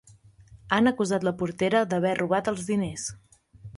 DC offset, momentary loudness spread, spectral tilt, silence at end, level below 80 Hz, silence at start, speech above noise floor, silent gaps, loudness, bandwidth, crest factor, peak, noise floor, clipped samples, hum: under 0.1%; 7 LU; -5 dB/octave; 0.05 s; -58 dBFS; 0.5 s; 28 dB; none; -26 LUFS; 11.5 kHz; 20 dB; -8 dBFS; -54 dBFS; under 0.1%; none